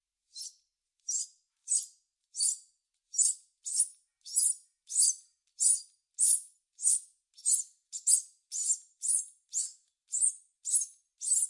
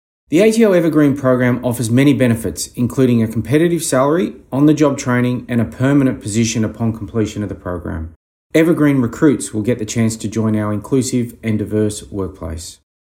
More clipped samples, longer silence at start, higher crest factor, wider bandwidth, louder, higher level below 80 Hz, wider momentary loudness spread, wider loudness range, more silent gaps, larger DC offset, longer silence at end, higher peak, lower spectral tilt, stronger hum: neither; about the same, 0.35 s vs 0.3 s; first, 24 dB vs 14 dB; second, 11.5 kHz vs 16.5 kHz; second, -29 LUFS vs -16 LUFS; second, under -90 dBFS vs -44 dBFS; first, 15 LU vs 12 LU; about the same, 4 LU vs 4 LU; second, none vs 8.16-8.50 s; neither; second, 0 s vs 0.4 s; second, -10 dBFS vs 0 dBFS; second, 11 dB/octave vs -6 dB/octave; neither